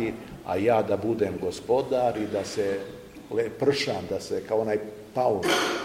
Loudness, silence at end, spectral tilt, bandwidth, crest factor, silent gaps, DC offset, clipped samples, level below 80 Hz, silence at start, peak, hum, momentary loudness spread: -27 LUFS; 0 s; -4.5 dB/octave; 16 kHz; 18 dB; none; under 0.1%; under 0.1%; -58 dBFS; 0 s; -10 dBFS; none; 9 LU